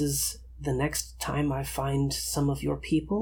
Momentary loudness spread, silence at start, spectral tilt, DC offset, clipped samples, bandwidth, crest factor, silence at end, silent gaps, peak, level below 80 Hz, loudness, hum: 4 LU; 0 s; -4.5 dB/octave; under 0.1%; under 0.1%; 19 kHz; 14 dB; 0 s; none; -14 dBFS; -44 dBFS; -29 LUFS; none